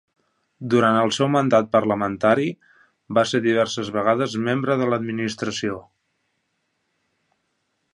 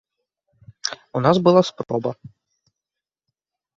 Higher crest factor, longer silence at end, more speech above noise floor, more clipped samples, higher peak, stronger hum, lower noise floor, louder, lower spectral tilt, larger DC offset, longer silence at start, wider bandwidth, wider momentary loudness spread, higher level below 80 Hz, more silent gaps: about the same, 20 dB vs 22 dB; first, 2.1 s vs 1.65 s; second, 53 dB vs 69 dB; neither; about the same, -4 dBFS vs -2 dBFS; neither; second, -73 dBFS vs -87 dBFS; about the same, -21 LUFS vs -20 LUFS; about the same, -5.5 dB/octave vs -6 dB/octave; neither; second, 0.6 s vs 0.85 s; first, 11.5 kHz vs 7.8 kHz; second, 9 LU vs 14 LU; about the same, -62 dBFS vs -60 dBFS; neither